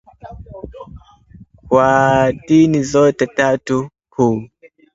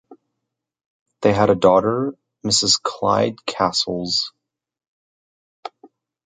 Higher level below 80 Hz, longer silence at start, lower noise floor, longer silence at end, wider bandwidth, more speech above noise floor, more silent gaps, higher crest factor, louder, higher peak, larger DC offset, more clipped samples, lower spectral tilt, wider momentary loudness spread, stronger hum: first, -44 dBFS vs -52 dBFS; first, 0.25 s vs 0.1 s; second, -44 dBFS vs -81 dBFS; about the same, 0.5 s vs 0.55 s; second, 7.8 kHz vs 9.6 kHz; second, 30 dB vs 63 dB; second, none vs 0.86-1.06 s, 4.88-5.63 s; about the same, 16 dB vs 20 dB; first, -15 LUFS vs -18 LUFS; about the same, 0 dBFS vs -2 dBFS; neither; neither; first, -6.5 dB/octave vs -3.5 dB/octave; first, 22 LU vs 17 LU; neither